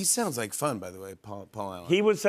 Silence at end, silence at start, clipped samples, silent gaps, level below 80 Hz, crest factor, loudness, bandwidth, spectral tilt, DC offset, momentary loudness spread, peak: 0 s; 0 s; under 0.1%; none; -70 dBFS; 18 dB; -29 LUFS; 15.5 kHz; -3.5 dB/octave; under 0.1%; 17 LU; -12 dBFS